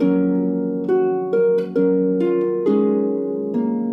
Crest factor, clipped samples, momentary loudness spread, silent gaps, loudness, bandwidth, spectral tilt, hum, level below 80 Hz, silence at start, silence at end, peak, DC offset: 12 dB; under 0.1%; 4 LU; none; -19 LUFS; 5.4 kHz; -10.5 dB/octave; none; -66 dBFS; 0 s; 0 s; -6 dBFS; under 0.1%